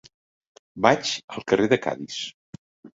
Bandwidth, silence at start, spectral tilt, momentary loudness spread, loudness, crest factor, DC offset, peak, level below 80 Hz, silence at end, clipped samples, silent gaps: 8 kHz; 0.75 s; -4 dB/octave; 12 LU; -23 LUFS; 24 dB; under 0.1%; -2 dBFS; -60 dBFS; 0.1 s; under 0.1%; 1.24-1.28 s, 2.34-2.83 s